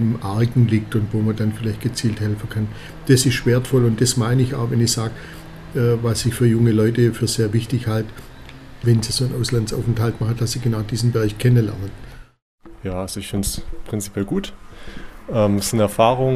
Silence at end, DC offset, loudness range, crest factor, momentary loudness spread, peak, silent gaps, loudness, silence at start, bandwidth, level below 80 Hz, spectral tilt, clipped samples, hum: 0 s; under 0.1%; 5 LU; 18 dB; 15 LU; 0 dBFS; 12.42-12.58 s; -20 LUFS; 0 s; 15 kHz; -38 dBFS; -6 dB/octave; under 0.1%; none